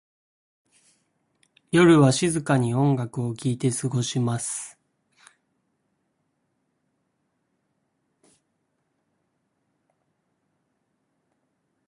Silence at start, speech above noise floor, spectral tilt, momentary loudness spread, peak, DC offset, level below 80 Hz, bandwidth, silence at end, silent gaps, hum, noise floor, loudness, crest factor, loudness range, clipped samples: 1.75 s; 53 dB; -5.5 dB/octave; 13 LU; -6 dBFS; under 0.1%; -62 dBFS; 11.5 kHz; 7.2 s; none; none; -74 dBFS; -22 LUFS; 22 dB; 12 LU; under 0.1%